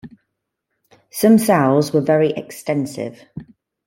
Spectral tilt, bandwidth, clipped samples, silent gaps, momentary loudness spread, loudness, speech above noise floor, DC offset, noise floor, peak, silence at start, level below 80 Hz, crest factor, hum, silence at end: -6 dB/octave; 16.5 kHz; under 0.1%; none; 21 LU; -17 LUFS; 60 dB; under 0.1%; -76 dBFS; -2 dBFS; 0.05 s; -60 dBFS; 18 dB; none; 0.45 s